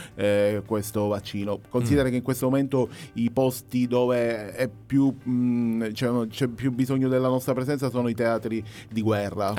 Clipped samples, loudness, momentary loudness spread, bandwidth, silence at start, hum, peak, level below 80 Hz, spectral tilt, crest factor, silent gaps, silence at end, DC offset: under 0.1%; -25 LUFS; 6 LU; 17.5 kHz; 0 s; none; -6 dBFS; -52 dBFS; -6.5 dB/octave; 18 dB; none; 0 s; under 0.1%